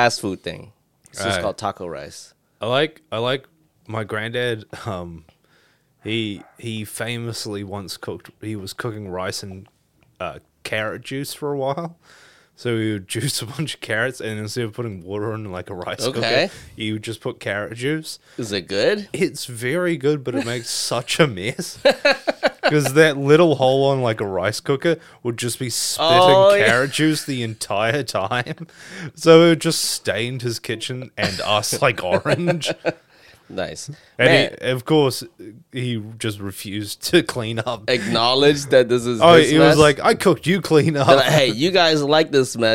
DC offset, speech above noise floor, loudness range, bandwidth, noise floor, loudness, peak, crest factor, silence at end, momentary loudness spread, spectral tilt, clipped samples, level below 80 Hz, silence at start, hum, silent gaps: 0.1%; 40 dB; 13 LU; 16.5 kHz; -59 dBFS; -19 LUFS; 0 dBFS; 20 dB; 0 s; 17 LU; -4.5 dB/octave; under 0.1%; -56 dBFS; 0 s; none; none